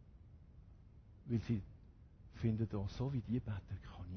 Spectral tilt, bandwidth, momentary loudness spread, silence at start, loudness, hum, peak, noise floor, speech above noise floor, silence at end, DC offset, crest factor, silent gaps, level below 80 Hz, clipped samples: -8.5 dB/octave; 6.4 kHz; 23 LU; 0 s; -42 LUFS; none; -26 dBFS; -60 dBFS; 21 dB; 0 s; under 0.1%; 18 dB; none; -56 dBFS; under 0.1%